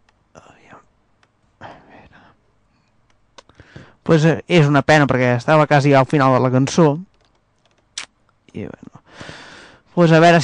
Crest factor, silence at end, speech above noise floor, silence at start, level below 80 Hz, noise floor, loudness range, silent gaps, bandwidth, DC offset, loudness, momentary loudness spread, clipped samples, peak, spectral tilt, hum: 14 dB; 0 s; 47 dB; 1.6 s; -54 dBFS; -60 dBFS; 9 LU; none; 9.8 kHz; under 0.1%; -14 LUFS; 23 LU; under 0.1%; -4 dBFS; -6.5 dB/octave; 50 Hz at -45 dBFS